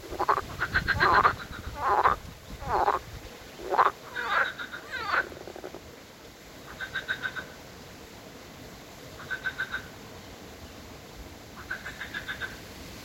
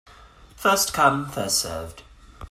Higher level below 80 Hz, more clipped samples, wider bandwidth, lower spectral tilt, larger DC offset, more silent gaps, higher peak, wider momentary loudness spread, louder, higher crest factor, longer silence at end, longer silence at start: about the same, -50 dBFS vs -48 dBFS; neither; about the same, 16.5 kHz vs 16 kHz; first, -4 dB/octave vs -2.5 dB/octave; neither; neither; about the same, -6 dBFS vs -4 dBFS; first, 21 LU vs 14 LU; second, -29 LUFS vs -22 LUFS; about the same, 24 dB vs 22 dB; about the same, 0 s vs 0 s; second, 0 s vs 0.2 s